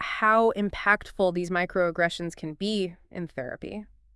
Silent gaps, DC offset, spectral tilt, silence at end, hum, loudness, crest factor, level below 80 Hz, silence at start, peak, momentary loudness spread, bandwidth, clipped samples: none; under 0.1%; -5.5 dB/octave; 0.3 s; none; -26 LUFS; 20 dB; -52 dBFS; 0 s; -6 dBFS; 15 LU; 12 kHz; under 0.1%